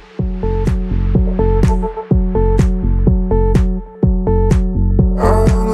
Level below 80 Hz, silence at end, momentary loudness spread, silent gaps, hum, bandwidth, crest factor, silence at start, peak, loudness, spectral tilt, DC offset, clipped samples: -16 dBFS; 0 s; 5 LU; none; none; 9.4 kHz; 12 dB; 0.2 s; 0 dBFS; -15 LUFS; -9 dB/octave; under 0.1%; under 0.1%